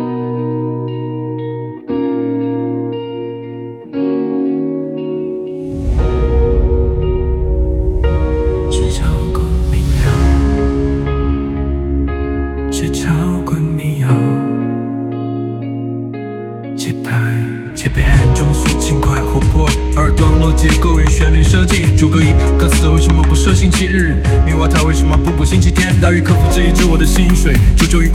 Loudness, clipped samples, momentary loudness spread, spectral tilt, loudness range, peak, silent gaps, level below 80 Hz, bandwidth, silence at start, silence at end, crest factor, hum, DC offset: -14 LUFS; under 0.1%; 10 LU; -6 dB/octave; 8 LU; 0 dBFS; none; -16 dBFS; 14.5 kHz; 0 s; 0 s; 12 dB; none; under 0.1%